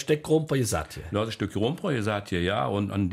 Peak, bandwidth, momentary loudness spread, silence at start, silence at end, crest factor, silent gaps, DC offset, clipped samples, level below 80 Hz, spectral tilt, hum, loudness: -12 dBFS; 15.5 kHz; 6 LU; 0 s; 0 s; 16 dB; none; under 0.1%; under 0.1%; -50 dBFS; -5.5 dB/octave; none; -27 LUFS